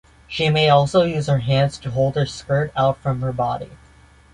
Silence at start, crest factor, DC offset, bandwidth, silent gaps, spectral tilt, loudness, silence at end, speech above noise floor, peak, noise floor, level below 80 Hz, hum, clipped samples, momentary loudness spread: 0.3 s; 18 dB; under 0.1%; 10.5 kHz; none; -6.5 dB/octave; -19 LUFS; 0.6 s; 30 dB; -2 dBFS; -49 dBFS; -46 dBFS; none; under 0.1%; 9 LU